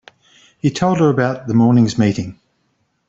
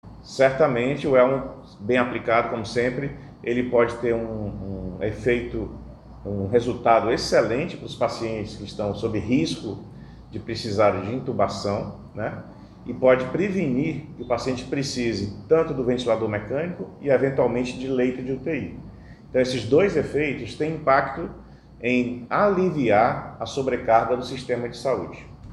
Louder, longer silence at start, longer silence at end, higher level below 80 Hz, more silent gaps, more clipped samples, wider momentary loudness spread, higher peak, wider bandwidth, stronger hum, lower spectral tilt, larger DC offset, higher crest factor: first, -16 LUFS vs -24 LUFS; first, 0.65 s vs 0.05 s; first, 0.75 s vs 0 s; about the same, -52 dBFS vs -48 dBFS; neither; neither; second, 9 LU vs 14 LU; about the same, -2 dBFS vs -4 dBFS; second, 8 kHz vs 12 kHz; neither; about the same, -7 dB/octave vs -6 dB/octave; neither; second, 14 dB vs 20 dB